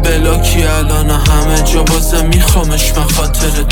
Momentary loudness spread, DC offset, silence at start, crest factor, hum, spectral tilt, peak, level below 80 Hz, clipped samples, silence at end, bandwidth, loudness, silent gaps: 2 LU; under 0.1%; 0 s; 10 dB; none; -4 dB/octave; 0 dBFS; -12 dBFS; under 0.1%; 0 s; 18.5 kHz; -12 LUFS; none